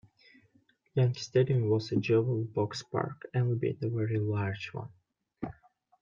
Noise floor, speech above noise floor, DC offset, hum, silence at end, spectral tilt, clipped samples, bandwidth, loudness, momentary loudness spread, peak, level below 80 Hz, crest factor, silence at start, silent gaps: -68 dBFS; 39 dB; under 0.1%; none; 0.5 s; -7.5 dB/octave; under 0.1%; 7.4 kHz; -31 LUFS; 15 LU; -14 dBFS; -68 dBFS; 18 dB; 0.95 s; none